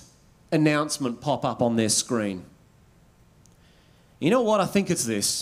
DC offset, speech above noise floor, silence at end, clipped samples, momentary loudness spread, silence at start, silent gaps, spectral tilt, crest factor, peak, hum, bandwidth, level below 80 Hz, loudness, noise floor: under 0.1%; 33 dB; 0 s; under 0.1%; 7 LU; 0.5 s; none; -4 dB/octave; 18 dB; -8 dBFS; none; 16 kHz; -62 dBFS; -24 LUFS; -57 dBFS